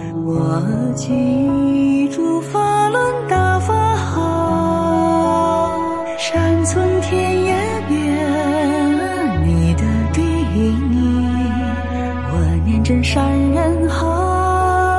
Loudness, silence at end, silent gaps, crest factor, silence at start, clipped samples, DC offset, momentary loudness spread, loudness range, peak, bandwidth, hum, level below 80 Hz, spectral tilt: -17 LUFS; 0 s; none; 12 dB; 0 s; under 0.1%; 0.5%; 4 LU; 1 LU; -4 dBFS; 11.5 kHz; none; -32 dBFS; -6.5 dB/octave